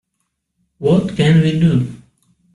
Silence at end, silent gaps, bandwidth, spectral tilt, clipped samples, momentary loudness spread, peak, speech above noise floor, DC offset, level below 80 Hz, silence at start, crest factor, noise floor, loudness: 0.6 s; none; 11 kHz; -8 dB/octave; under 0.1%; 8 LU; -4 dBFS; 59 dB; under 0.1%; -46 dBFS; 0.8 s; 14 dB; -72 dBFS; -15 LUFS